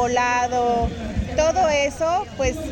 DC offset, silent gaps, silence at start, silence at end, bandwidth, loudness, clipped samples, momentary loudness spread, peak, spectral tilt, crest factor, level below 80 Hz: under 0.1%; none; 0 s; 0 s; 17 kHz; -21 LUFS; under 0.1%; 6 LU; -6 dBFS; -4.5 dB/octave; 14 dB; -34 dBFS